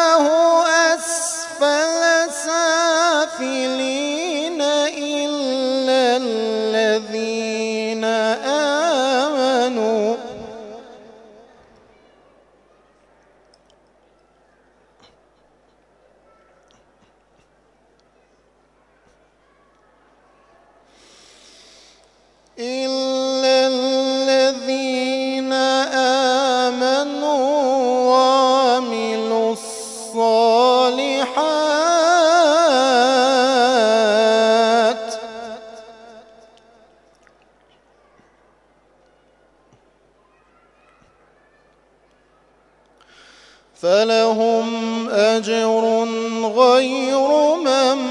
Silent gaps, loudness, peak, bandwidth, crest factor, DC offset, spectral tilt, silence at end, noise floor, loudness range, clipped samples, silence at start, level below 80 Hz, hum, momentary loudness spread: none; -17 LUFS; 0 dBFS; 11.5 kHz; 18 dB; under 0.1%; -2 dB/octave; 0 s; -58 dBFS; 8 LU; under 0.1%; 0 s; -66 dBFS; 50 Hz at -65 dBFS; 8 LU